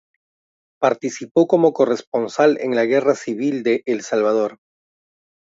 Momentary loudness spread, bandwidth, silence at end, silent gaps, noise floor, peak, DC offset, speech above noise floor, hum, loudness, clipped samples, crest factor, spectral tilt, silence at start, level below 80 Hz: 6 LU; 7.8 kHz; 0.85 s; 1.31-1.35 s, 2.07-2.12 s; under -90 dBFS; -2 dBFS; under 0.1%; over 72 dB; none; -19 LUFS; under 0.1%; 18 dB; -5.5 dB/octave; 0.8 s; -72 dBFS